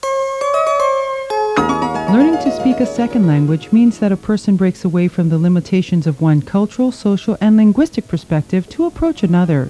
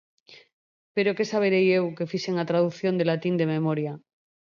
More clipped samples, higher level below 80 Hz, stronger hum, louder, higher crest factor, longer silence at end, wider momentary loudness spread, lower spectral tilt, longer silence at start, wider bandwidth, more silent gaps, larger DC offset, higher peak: neither; first, -42 dBFS vs -74 dBFS; neither; first, -15 LUFS vs -25 LUFS; about the same, 12 dB vs 16 dB; second, 0 s vs 0.6 s; second, 6 LU vs 9 LU; about the same, -8 dB/octave vs -7 dB/octave; second, 0 s vs 0.3 s; first, 11 kHz vs 7.2 kHz; second, none vs 0.53-0.95 s; neither; first, -2 dBFS vs -10 dBFS